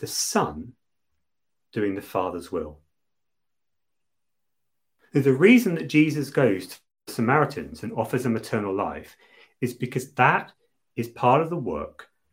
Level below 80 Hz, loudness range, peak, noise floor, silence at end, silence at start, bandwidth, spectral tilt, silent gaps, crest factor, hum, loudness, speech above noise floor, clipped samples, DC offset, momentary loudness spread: -58 dBFS; 11 LU; -4 dBFS; -87 dBFS; 0.3 s; 0 s; 16.5 kHz; -5.5 dB/octave; none; 22 dB; none; -24 LUFS; 64 dB; under 0.1%; under 0.1%; 16 LU